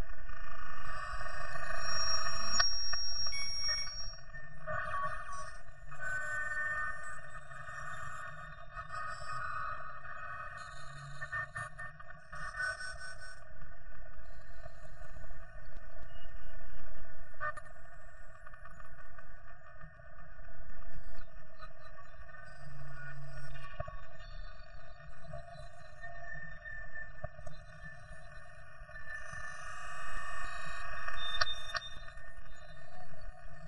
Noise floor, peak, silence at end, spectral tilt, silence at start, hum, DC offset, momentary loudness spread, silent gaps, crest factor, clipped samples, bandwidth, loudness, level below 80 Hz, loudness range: -51 dBFS; -12 dBFS; 0 s; -1.5 dB/octave; 0 s; none; under 0.1%; 20 LU; none; 20 dB; under 0.1%; 11.5 kHz; -40 LUFS; -52 dBFS; 19 LU